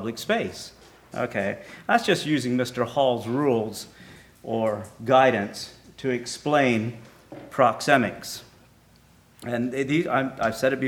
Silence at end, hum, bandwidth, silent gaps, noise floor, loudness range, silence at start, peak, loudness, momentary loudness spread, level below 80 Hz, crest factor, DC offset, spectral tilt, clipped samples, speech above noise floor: 0 s; none; 18.5 kHz; none; -56 dBFS; 2 LU; 0 s; -2 dBFS; -24 LUFS; 17 LU; -62 dBFS; 24 dB; under 0.1%; -5 dB/octave; under 0.1%; 32 dB